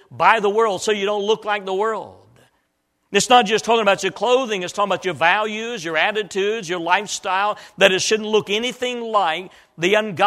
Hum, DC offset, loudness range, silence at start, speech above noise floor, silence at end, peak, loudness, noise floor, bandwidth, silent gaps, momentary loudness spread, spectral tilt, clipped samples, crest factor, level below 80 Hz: none; under 0.1%; 2 LU; 0.1 s; 50 dB; 0 s; 0 dBFS; -19 LUFS; -69 dBFS; 14.5 kHz; none; 8 LU; -2.5 dB/octave; under 0.1%; 20 dB; -64 dBFS